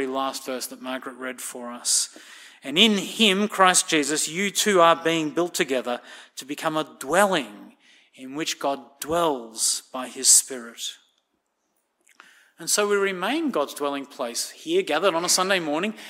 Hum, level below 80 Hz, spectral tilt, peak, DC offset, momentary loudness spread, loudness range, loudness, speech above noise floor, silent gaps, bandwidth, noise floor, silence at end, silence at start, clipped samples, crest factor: none; -68 dBFS; -1.5 dB/octave; 0 dBFS; under 0.1%; 16 LU; 7 LU; -22 LUFS; 50 dB; none; 16 kHz; -74 dBFS; 0 s; 0 s; under 0.1%; 24 dB